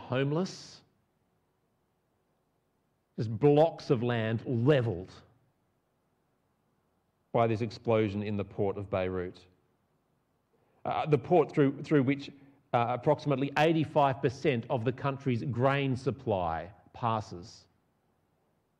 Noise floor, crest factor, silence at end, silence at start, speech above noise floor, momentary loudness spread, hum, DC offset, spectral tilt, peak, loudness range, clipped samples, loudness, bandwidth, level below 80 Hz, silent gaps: -76 dBFS; 18 dB; 1.25 s; 0 s; 46 dB; 12 LU; none; under 0.1%; -7.5 dB/octave; -14 dBFS; 6 LU; under 0.1%; -30 LUFS; 9.4 kHz; -66 dBFS; none